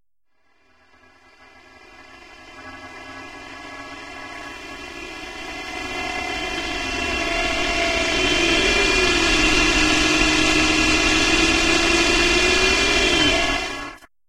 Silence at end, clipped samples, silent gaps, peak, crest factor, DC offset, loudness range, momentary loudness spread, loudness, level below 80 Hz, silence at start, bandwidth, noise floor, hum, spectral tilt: 0.3 s; under 0.1%; none; -2 dBFS; 18 dB; under 0.1%; 20 LU; 20 LU; -17 LUFS; -34 dBFS; 2 s; 16 kHz; -71 dBFS; none; -2 dB/octave